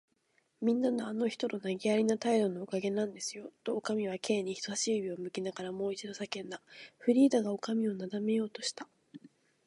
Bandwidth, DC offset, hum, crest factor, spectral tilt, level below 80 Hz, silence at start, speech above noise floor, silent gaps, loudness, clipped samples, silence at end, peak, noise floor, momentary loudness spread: 11.5 kHz; under 0.1%; none; 18 dB; -4.5 dB/octave; -82 dBFS; 0.6 s; 42 dB; none; -33 LUFS; under 0.1%; 0.4 s; -16 dBFS; -75 dBFS; 11 LU